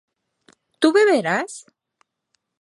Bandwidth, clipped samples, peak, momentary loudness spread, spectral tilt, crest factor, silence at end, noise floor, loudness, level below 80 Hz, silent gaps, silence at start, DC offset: 11.5 kHz; under 0.1%; -2 dBFS; 17 LU; -4 dB/octave; 20 dB; 1 s; -73 dBFS; -18 LUFS; -80 dBFS; none; 0.8 s; under 0.1%